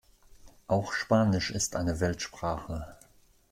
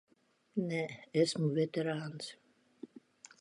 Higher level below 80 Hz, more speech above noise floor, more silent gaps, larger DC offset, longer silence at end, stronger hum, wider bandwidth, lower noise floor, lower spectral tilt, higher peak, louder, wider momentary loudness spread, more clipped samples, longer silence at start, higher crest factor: first, -50 dBFS vs -82 dBFS; about the same, 31 dB vs 30 dB; neither; neither; about the same, 0.55 s vs 0.55 s; neither; first, 16 kHz vs 11.5 kHz; second, -60 dBFS vs -64 dBFS; about the same, -5 dB/octave vs -5.5 dB/octave; first, -12 dBFS vs -18 dBFS; first, -30 LUFS vs -35 LUFS; second, 13 LU vs 22 LU; neither; about the same, 0.45 s vs 0.55 s; about the same, 18 dB vs 20 dB